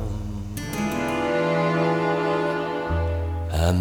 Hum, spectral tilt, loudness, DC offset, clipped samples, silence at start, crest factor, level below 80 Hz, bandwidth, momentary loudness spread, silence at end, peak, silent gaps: none; -6.5 dB/octave; -24 LUFS; under 0.1%; under 0.1%; 0 s; 16 dB; -34 dBFS; 18 kHz; 9 LU; 0 s; -6 dBFS; none